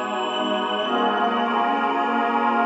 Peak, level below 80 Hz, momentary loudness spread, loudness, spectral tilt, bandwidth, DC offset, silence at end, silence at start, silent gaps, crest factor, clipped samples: -8 dBFS; -70 dBFS; 2 LU; -22 LUFS; -4.5 dB/octave; 8 kHz; under 0.1%; 0 s; 0 s; none; 14 dB; under 0.1%